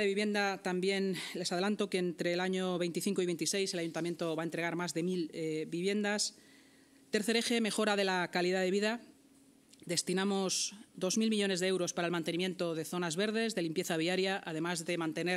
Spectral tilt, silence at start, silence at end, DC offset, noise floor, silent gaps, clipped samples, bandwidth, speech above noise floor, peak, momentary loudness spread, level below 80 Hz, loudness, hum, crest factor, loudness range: -4 dB/octave; 0 s; 0 s; under 0.1%; -63 dBFS; none; under 0.1%; 16 kHz; 29 dB; -16 dBFS; 5 LU; -86 dBFS; -34 LUFS; none; 20 dB; 2 LU